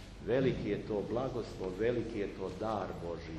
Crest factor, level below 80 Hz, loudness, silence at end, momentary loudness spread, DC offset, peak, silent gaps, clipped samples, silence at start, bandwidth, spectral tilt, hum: 16 dB; -52 dBFS; -36 LUFS; 0 s; 8 LU; under 0.1%; -18 dBFS; none; under 0.1%; 0 s; 12 kHz; -7.5 dB/octave; none